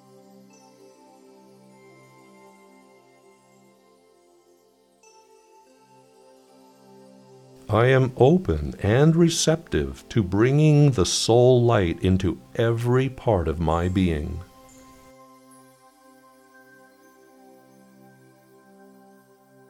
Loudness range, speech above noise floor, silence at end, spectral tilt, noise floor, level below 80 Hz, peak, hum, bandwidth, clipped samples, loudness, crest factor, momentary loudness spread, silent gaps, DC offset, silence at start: 10 LU; 40 dB; 5.25 s; -6 dB/octave; -60 dBFS; -44 dBFS; -4 dBFS; none; 14 kHz; under 0.1%; -21 LUFS; 20 dB; 10 LU; none; under 0.1%; 7.7 s